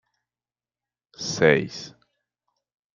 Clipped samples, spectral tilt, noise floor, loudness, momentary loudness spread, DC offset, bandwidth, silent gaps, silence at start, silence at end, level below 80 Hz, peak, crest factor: under 0.1%; -4.5 dB/octave; under -90 dBFS; -22 LUFS; 19 LU; under 0.1%; 7.6 kHz; none; 1.2 s; 1.05 s; -64 dBFS; -2 dBFS; 26 dB